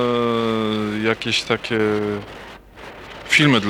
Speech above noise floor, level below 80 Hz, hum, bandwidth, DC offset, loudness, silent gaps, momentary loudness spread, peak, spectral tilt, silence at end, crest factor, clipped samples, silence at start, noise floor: 20 dB; -50 dBFS; none; 16.5 kHz; under 0.1%; -20 LUFS; none; 21 LU; -4 dBFS; -4.5 dB/octave; 0 s; 16 dB; under 0.1%; 0 s; -39 dBFS